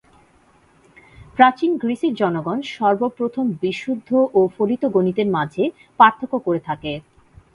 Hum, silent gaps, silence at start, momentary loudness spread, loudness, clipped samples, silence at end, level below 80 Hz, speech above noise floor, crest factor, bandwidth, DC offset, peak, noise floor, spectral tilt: none; none; 1.2 s; 11 LU; -19 LUFS; under 0.1%; 0.55 s; -56 dBFS; 36 dB; 20 dB; 11 kHz; under 0.1%; 0 dBFS; -55 dBFS; -7 dB/octave